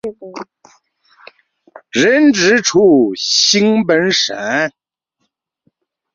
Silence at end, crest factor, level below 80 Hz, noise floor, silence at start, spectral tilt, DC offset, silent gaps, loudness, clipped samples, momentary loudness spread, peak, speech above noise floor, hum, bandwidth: 1.45 s; 14 dB; -58 dBFS; -71 dBFS; 0.05 s; -3 dB/octave; under 0.1%; none; -12 LUFS; under 0.1%; 15 LU; 0 dBFS; 58 dB; none; 8 kHz